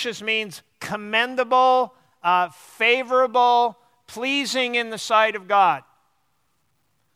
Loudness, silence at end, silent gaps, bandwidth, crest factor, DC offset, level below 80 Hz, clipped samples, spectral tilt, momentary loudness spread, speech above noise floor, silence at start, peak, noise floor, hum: -21 LUFS; 1.35 s; none; 15 kHz; 18 dB; under 0.1%; -74 dBFS; under 0.1%; -2.5 dB/octave; 12 LU; 50 dB; 0 s; -4 dBFS; -70 dBFS; none